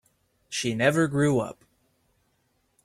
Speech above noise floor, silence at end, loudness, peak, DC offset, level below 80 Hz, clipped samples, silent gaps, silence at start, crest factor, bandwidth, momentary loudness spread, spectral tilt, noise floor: 47 dB; 1.35 s; -25 LUFS; -8 dBFS; under 0.1%; -62 dBFS; under 0.1%; none; 0.5 s; 22 dB; 14.5 kHz; 11 LU; -5 dB/octave; -71 dBFS